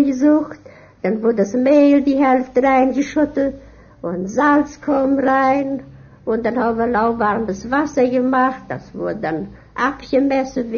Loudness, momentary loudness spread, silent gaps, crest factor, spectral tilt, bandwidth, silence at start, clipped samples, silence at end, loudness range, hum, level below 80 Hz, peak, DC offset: -17 LUFS; 11 LU; none; 14 dB; -6.5 dB/octave; 7 kHz; 0 s; under 0.1%; 0 s; 3 LU; none; -48 dBFS; -2 dBFS; under 0.1%